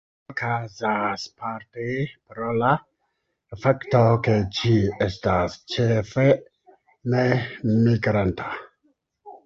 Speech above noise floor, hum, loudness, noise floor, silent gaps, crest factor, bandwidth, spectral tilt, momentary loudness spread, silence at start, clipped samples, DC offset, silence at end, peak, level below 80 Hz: 52 dB; none; -23 LUFS; -75 dBFS; none; 20 dB; 7.4 kHz; -7.5 dB/octave; 12 LU; 0.3 s; under 0.1%; under 0.1%; 0.1 s; -4 dBFS; -48 dBFS